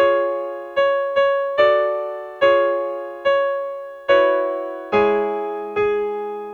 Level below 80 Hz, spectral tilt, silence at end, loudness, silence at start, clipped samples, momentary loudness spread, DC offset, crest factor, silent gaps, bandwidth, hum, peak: -58 dBFS; -5.5 dB/octave; 0 s; -20 LUFS; 0 s; under 0.1%; 10 LU; under 0.1%; 14 dB; none; 6.4 kHz; none; -4 dBFS